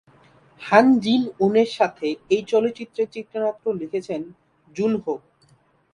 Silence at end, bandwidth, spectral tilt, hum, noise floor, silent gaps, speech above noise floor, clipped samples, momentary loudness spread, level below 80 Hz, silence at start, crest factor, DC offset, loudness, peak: 0.75 s; 10.5 kHz; -6 dB/octave; none; -59 dBFS; none; 38 dB; under 0.1%; 15 LU; -64 dBFS; 0.6 s; 22 dB; under 0.1%; -22 LUFS; 0 dBFS